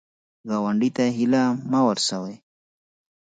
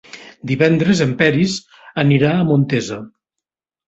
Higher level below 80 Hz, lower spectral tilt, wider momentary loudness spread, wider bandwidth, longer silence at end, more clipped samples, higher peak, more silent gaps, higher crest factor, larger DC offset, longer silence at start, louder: second, -70 dBFS vs -52 dBFS; second, -5 dB/octave vs -6.5 dB/octave; second, 11 LU vs 14 LU; first, 9.4 kHz vs 8 kHz; about the same, 0.9 s vs 0.8 s; neither; second, -8 dBFS vs 0 dBFS; neither; about the same, 16 dB vs 16 dB; neither; first, 0.45 s vs 0.15 s; second, -22 LUFS vs -16 LUFS